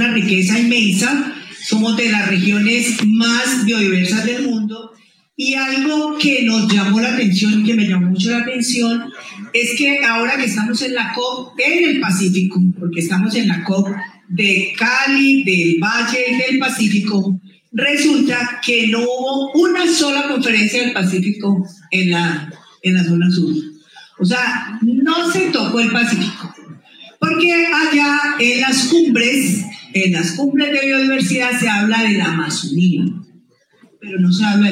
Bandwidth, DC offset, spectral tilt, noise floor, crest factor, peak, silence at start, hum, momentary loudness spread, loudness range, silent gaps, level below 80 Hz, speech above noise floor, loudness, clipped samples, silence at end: 16 kHz; under 0.1%; -4.5 dB/octave; -52 dBFS; 14 dB; -2 dBFS; 0 s; none; 7 LU; 3 LU; none; -78 dBFS; 37 dB; -15 LUFS; under 0.1%; 0 s